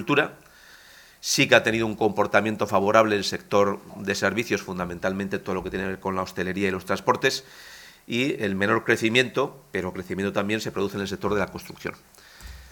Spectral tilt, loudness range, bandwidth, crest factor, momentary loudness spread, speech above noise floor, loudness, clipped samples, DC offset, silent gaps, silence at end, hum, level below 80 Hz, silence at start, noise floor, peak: -4 dB/octave; 5 LU; 19 kHz; 24 dB; 12 LU; 26 dB; -24 LUFS; under 0.1%; under 0.1%; none; 0.05 s; none; -54 dBFS; 0 s; -50 dBFS; 0 dBFS